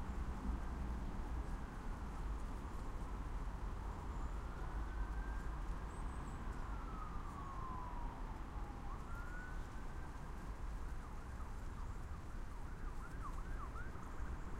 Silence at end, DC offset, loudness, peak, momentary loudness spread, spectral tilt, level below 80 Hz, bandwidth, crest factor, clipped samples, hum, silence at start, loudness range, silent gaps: 0 s; under 0.1%; -49 LUFS; -30 dBFS; 5 LU; -6.5 dB/octave; -46 dBFS; 13.5 kHz; 14 dB; under 0.1%; none; 0 s; 3 LU; none